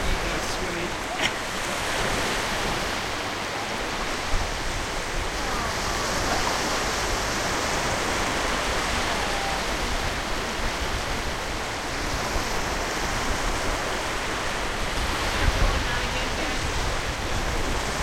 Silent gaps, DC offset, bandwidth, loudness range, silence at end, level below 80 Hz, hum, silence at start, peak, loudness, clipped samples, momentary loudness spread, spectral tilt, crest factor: none; under 0.1%; 16.5 kHz; 3 LU; 0 s; -32 dBFS; none; 0 s; -8 dBFS; -26 LUFS; under 0.1%; 4 LU; -3 dB/octave; 18 dB